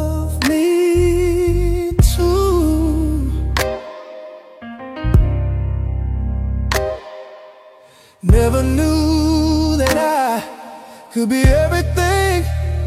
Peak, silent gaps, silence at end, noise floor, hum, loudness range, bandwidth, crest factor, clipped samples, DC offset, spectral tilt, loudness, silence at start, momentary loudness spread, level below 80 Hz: 0 dBFS; none; 0 s; -46 dBFS; none; 5 LU; 16 kHz; 16 dB; under 0.1%; under 0.1%; -6 dB/octave; -17 LUFS; 0 s; 19 LU; -22 dBFS